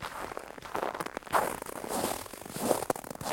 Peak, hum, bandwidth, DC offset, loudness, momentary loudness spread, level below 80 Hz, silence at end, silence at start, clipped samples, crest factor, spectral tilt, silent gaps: -8 dBFS; none; 17 kHz; under 0.1%; -34 LUFS; 10 LU; -60 dBFS; 0 s; 0 s; under 0.1%; 26 dB; -3 dB/octave; none